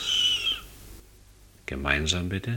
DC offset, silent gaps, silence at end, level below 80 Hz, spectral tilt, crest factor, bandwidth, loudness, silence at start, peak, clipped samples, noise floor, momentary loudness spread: under 0.1%; none; 0 s; -42 dBFS; -3 dB/octave; 20 dB; 18 kHz; -25 LUFS; 0 s; -8 dBFS; under 0.1%; -53 dBFS; 18 LU